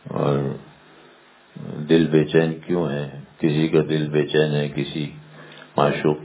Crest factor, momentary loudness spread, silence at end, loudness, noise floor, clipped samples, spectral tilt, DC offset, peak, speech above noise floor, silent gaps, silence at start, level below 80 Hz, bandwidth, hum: 20 dB; 17 LU; 0 s; -21 LUFS; -51 dBFS; under 0.1%; -11.5 dB/octave; under 0.1%; -2 dBFS; 31 dB; none; 0.05 s; -54 dBFS; 4 kHz; none